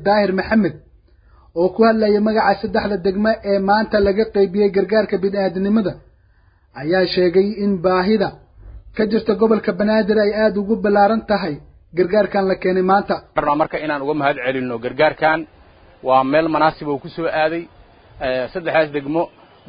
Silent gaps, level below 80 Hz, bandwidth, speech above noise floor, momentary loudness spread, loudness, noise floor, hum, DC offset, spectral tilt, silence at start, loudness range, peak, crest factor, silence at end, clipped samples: none; -46 dBFS; 5.2 kHz; 37 dB; 8 LU; -18 LUFS; -54 dBFS; none; under 0.1%; -11.5 dB/octave; 0 s; 2 LU; -2 dBFS; 16 dB; 0.4 s; under 0.1%